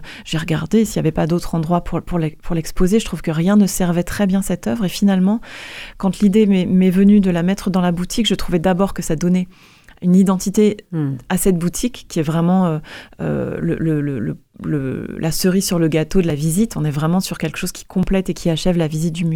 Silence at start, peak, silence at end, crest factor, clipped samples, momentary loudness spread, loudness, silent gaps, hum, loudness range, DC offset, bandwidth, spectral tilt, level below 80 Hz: 0 s; -2 dBFS; 0 s; 14 dB; under 0.1%; 9 LU; -18 LUFS; none; none; 4 LU; under 0.1%; 17 kHz; -6 dB/octave; -34 dBFS